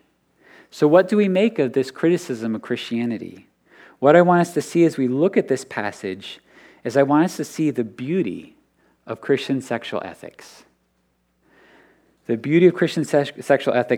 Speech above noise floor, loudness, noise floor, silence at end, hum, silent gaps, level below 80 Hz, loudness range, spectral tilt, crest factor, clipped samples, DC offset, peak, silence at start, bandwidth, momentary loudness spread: 47 dB; -20 LUFS; -67 dBFS; 0 s; none; none; -72 dBFS; 9 LU; -6.5 dB/octave; 20 dB; under 0.1%; under 0.1%; 0 dBFS; 0.75 s; 15 kHz; 17 LU